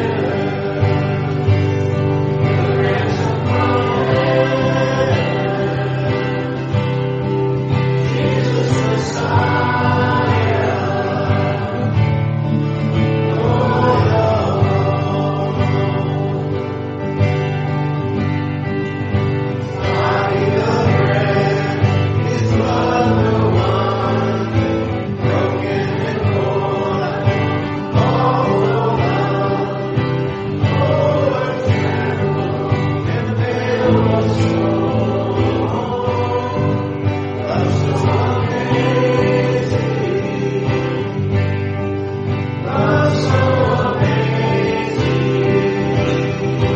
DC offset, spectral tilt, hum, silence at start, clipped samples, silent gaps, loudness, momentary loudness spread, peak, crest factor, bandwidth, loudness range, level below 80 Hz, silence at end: under 0.1%; -7.5 dB/octave; none; 0 s; under 0.1%; none; -17 LUFS; 5 LU; -2 dBFS; 14 dB; 7.8 kHz; 2 LU; -42 dBFS; 0 s